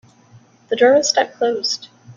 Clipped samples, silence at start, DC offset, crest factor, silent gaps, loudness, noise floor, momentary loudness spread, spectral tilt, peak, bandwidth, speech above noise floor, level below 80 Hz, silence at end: under 0.1%; 0.7 s; under 0.1%; 18 dB; none; -17 LUFS; -49 dBFS; 12 LU; -2 dB/octave; -2 dBFS; 7.6 kHz; 33 dB; -68 dBFS; 0.05 s